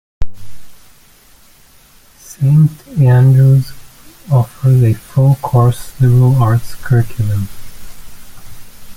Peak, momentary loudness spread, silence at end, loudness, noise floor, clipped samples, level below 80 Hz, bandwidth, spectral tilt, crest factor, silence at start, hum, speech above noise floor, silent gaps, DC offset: -2 dBFS; 11 LU; 0.05 s; -12 LUFS; -44 dBFS; under 0.1%; -34 dBFS; 16 kHz; -8.5 dB/octave; 12 dB; 0.2 s; none; 34 dB; none; under 0.1%